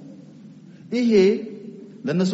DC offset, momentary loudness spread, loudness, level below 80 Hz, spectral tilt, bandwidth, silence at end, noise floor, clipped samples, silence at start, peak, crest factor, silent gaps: under 0.1%; 23 LU; -21 LUFS; -64 dBFS; -6.5 dB/octave; 8 kHz; 0 s; -44 dBFS; under 0.1%; 0 s; -6 dBFS; 16 dB; none